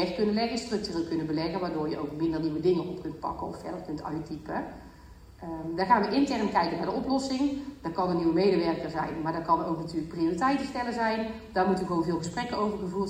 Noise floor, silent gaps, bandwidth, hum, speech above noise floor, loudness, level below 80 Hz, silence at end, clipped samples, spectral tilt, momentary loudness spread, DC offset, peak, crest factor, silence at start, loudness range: -50 dBFS; none; 15.5 kHz; none; 21 dB; -29 LUFS; -54 dBFS; 0 s; under 0.1%; -6 dB/octave; 11 LU; under 0.1%; -10 dBFS; 20 dB; 0 s; 5 LU